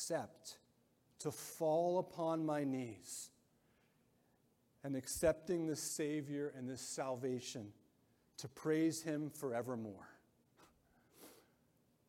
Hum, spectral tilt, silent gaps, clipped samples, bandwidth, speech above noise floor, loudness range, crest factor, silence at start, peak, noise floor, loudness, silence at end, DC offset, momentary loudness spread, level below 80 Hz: none; -5 dB/octave; none; under 0.1%; 16.5 kHz; 35 dB; 2 LU; 20 dB; 0 s; -22 dBFS; -76 dBFS; -41 LUFS; 0.75 s; under 0.1%; 18 LU; -72 dBFS